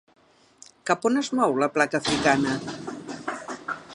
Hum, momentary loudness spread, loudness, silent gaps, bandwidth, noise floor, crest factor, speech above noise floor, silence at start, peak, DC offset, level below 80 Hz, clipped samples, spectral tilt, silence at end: none; 13 LU; -25 LUFS; none; 11.5 kHz; -54 dBFS; 22 dB; 31 dB; 0.85 s; -4 dBFS; under 0.1%; -60 dBFS; under 0.1%; -4 dB/octave; 0 s